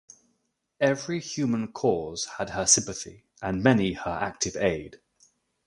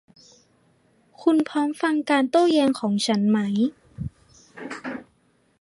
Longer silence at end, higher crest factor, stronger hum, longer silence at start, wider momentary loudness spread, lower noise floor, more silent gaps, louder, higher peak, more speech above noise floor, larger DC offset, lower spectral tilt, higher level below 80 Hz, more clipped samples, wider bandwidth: about the same, 0.7 s vs 0.6 s; about the same, 22 dB vs 18 dB; neither; second, 0.8 s vs 1.2 s; about the same, 15 LU vs 17 LU; first, -75 dBFS vs -64 dBFS; neither; second, -26 LUFS vs -22 LUFS; about the same, -6 dBFS vs -6 dBFS; first, 49 dB vs 43 dB; neither; second, -3.5 dB/octave vs -5.5 dB/octave; about the same, -54 dBFS vs -56 dBFS; neither; about the same, 11.5 kHz vs 11.5 kHz